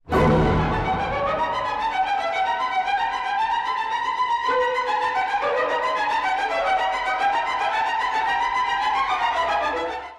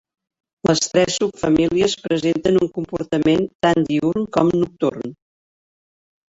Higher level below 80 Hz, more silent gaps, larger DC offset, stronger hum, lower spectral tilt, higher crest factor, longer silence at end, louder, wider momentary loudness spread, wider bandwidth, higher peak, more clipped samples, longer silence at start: first, -40 dBFS vs -50 dBFS; second, none vs 3.55-3.60 s; neither; neither; about the same, -5 dB/octave vs -5 dB/octave; second, 12 dB vs 18 dB; second, 0 s vs 1.15 s; second, -22 LUFS vs -19 LUFS; second, 3 LU vs 6 LU; first, 12.5 kHz vs 8 kHz; second, -10 dBFS vs -2 dBFS; neither; second, 0.05 s vs 0.65 s